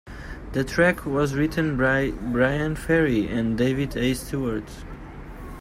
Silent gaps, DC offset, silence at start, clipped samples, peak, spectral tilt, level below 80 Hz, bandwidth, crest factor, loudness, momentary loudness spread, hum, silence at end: none; under 0.1%; 0.05 s; under 0.1%; -6 dBFS; -6.5 dB/octave; -40 dBFS; 16 kHz; 18 dB; -23 LUFS; 19 LU; none; 0 s